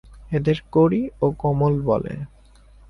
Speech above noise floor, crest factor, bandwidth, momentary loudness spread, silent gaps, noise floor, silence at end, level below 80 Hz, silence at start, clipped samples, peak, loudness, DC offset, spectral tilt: 29 dB; 16 dB; 6.2 kHz; 13 LU; none; -49 dBFS; 0.6 s; -44 dBFS; 0.1 s; under 0.1%; -6 dBFS; -21 LUFS; under 0.1%; -9.5 dB/octave